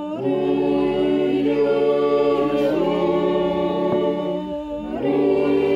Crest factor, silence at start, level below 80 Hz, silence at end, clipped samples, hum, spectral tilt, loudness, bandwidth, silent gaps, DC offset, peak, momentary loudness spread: 12 dB; 0 s; -50 dBFS; 0 s; under 0.1%; none; -8 dB/octave; -20 LUFS; 7.6 kHz; none; under 0.1%; -8 dBFS; 6 LU